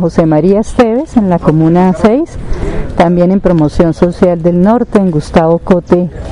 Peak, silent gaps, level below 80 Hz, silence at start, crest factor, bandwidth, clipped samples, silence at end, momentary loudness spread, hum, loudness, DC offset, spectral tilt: 0 dBFS; none; -24 dBFS; 0 s; 8 dB; 10.5 kHz; 0.8%; 0 s; 4 LU; none; -10 LUFS; 0.3%; -8.5 dB/octave